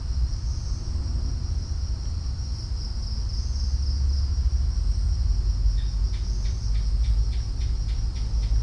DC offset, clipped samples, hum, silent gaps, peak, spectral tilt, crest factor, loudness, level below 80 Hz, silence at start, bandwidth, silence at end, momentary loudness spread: under 0.1%; under 0.1%; none; none; -12 dBFS; -5.5 dB/octave; 12 dB; -28 LUFS; -24 dBFS; 0 s; 8.4 kHz; 0 s; 5 LU